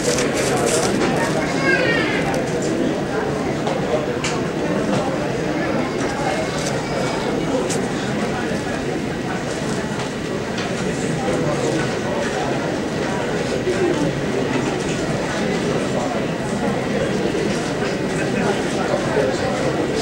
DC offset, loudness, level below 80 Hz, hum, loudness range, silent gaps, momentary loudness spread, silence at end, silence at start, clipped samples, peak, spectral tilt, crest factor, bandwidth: under 0.1%; -21 LUFS; -42 dBFS; none; 3 LU; none; 4 LU; 0 s; 0 s; under 0.1%; -4 dBFS; -5 dB/octave; 16 dB; 16 kHz